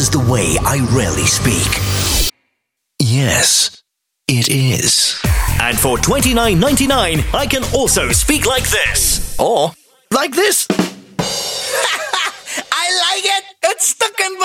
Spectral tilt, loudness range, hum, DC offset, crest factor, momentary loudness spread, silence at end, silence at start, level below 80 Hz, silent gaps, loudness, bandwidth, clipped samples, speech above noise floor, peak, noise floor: -3 dB/octave; 3 LU; none; under 0.1%; 16 dB; 6 LU; 0 s; 0 s; -28 dBFS; none; -14 LUFS; 19 kHz; under 0.1%; 58 dB; 0 dBFS; -72 dBFS